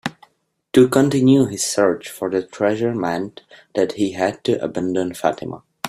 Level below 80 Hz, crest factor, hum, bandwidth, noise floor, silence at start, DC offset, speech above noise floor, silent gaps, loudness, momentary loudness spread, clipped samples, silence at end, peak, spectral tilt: -58 dBFS; 18 dB; none; 15 kHz; -64 dBFS; 0.05 s; under 0.1%; 46 dB; none; -19 LUFS; 12 LU; under 0.1%; 0 s; -2 dBFS; -5.5 dB/octave